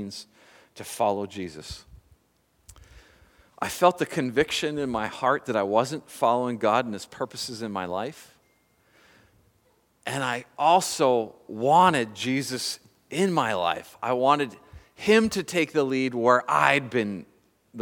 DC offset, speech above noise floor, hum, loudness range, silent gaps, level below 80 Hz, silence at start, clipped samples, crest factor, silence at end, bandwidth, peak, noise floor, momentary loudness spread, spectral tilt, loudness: under 0.1%; 42 dB; none; 11 LU; none; -60 dBFS; 0 s; under 0.1%; 24 dB; 0 s; 19 kHz; -2 dBFS; -67 dBFS; 15 LU; -4.5 dB/octave; -25 LUFS